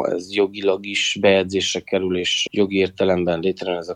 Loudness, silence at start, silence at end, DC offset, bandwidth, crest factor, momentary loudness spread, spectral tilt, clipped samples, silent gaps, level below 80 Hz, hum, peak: -20 LUFS; 0 s; 0 s; under 0.1%; 10.5 kHz; 16 dB; 6 LU; -4 dB/octave; under 0.1%; none; -62 dBFS; none; -4 dBFS